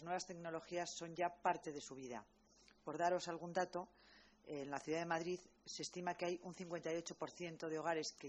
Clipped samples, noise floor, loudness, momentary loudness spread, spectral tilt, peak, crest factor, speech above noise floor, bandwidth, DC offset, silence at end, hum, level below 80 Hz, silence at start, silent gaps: under 0.1%; -71 dBFS; -45 LUFS; 11 LU; -4 dB/octave; -24 dBFS; 20 dB; 26 dB; 8.4 kHz; under 0.1%; 0 s; none; -80 dBFS; 0 s; none